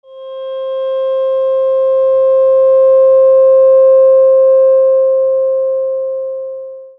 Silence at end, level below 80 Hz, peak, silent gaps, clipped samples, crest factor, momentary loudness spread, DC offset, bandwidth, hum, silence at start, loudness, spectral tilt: 0.1 s; -62 dBFS; -2 dBFS; none; under 0.1%; 8 dB; 14 LU; under 0.1%; 3.5 kHz; none; 0.1 s; -10 LUFS; -5 dB/octave